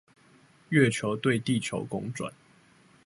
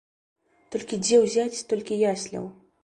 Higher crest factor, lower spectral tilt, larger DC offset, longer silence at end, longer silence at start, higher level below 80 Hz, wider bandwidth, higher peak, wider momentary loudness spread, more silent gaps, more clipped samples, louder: about the same, 22 dB vs 18 dB; first, -5.5 dB/octave vs -4 dB/octave; neither; first, 0.75 s vs 0.3 s; about the same, 0.7 s vs 0.7 s; about the same, -66 dBFS vs -66 dBFS; about the same, 11.5 kHz vs 11.5 kHz; about the same, -8 dBFS vs -8 dBFS; about the same, 13 LU vs 15 LU; neither; neither; second, -28 LUFS vs -25 LUFS